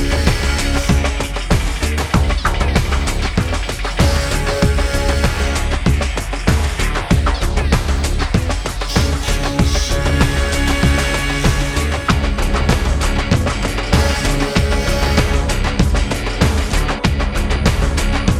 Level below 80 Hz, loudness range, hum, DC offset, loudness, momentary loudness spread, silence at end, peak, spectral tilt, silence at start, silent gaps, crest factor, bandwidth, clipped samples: -18 dBFS; 1 LU; none; under 0.1%; -17 LUFS; 3 LU; 0 s; 0 dBFS; -5 dB/octave; 0 s; none; 16 dB; 15.5 kHz; under 0.1%